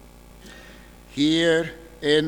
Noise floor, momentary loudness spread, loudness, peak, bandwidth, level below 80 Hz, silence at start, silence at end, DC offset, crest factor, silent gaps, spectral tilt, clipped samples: -46 dBFS; 24 LU; -22 LUFS; -6 dBFS; 19 kHz; -50 dBFS; 0.45 s; 0 s; under 0.1%; 18 dB; none; -4.5 dB/octave; under 0.1%